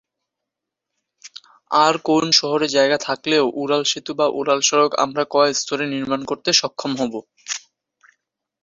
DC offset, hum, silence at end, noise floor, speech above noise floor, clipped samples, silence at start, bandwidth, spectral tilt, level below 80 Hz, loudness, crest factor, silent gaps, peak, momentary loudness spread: under 0.1%; none; 1.05 s; -83 dBFS; 64 dB; under 0.1%; 1.25 s; 7.8 kHz; -2.5 dB/octave; -64 dBFS; -19 LUFS; 20 dB; none; 0 dBFS; 13 LU